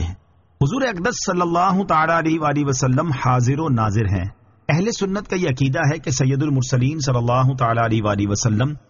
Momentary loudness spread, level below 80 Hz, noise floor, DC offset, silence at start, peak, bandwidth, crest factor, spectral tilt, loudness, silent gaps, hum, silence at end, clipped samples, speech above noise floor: 5 LU; -42 dBFS; -42 dBFS; under 0.1%; 0 s; -6 dBFS; 7.4 kHz; 14 dB; -6 dB/octave; -19 LUFS; none; none; 0.1 s; under 0.1%; 23 dB